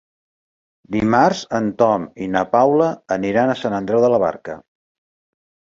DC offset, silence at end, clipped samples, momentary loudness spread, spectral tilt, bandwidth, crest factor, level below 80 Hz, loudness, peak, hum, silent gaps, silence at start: under 0.1%; 1.2 s; under 0.1%; 8 LU; -6.5 dB/octave; 7.6 kHz; 18 dB; -52 dBFS; -18 LUFS; -2 dBFS; none; none; 0.9 s